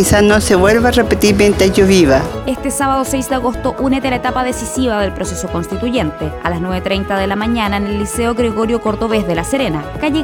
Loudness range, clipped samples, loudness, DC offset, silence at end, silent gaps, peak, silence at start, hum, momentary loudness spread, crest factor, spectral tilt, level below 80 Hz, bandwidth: 6 LU; under 0.1%; -14 LUFS; under 0.1%; 0 s; none; 0 dBFS; 0 s; none; 9 LU; 14 dB; -5 dB/octave; -28 dBFS; 19 kHz